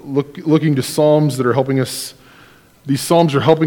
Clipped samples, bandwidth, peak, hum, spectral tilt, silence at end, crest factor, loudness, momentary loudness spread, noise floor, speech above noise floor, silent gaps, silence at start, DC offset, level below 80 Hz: 0.1%; 19 kHz; 0 dBFS; none; -6 dB/octave; 0 s; 16 dB; -16 LUFS; 10 LU; -46 dBFS; 31 dB; none; 0.05 s; under 0.1%; -56 dBFS